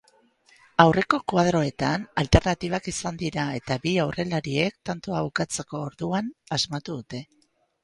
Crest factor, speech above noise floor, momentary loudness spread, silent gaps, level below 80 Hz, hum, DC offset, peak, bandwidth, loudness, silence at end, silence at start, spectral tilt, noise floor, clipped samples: 26 dB; 36 dB; 12 LU; none; -42 dBFS; none; under 0.1%; 0 dBFS; 11.5 kHz; -25 LUFS; 0.6 s; 0.8 s; -5 dB/octave; -61 dBFS; under 0.1%